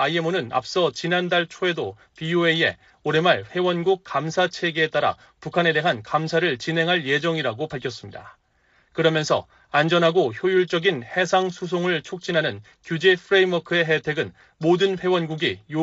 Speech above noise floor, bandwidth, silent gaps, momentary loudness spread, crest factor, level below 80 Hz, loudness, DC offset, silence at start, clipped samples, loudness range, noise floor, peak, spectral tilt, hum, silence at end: 40 dB; 8 kHz; none; 10 LU; 18 dB; -64 dBFS; -22 LUFS; under 0.1%; 0 s; under 0.1%; 2 LU; -62 dBFS; -4 dBFS; -3 dB/octave; none; 0 s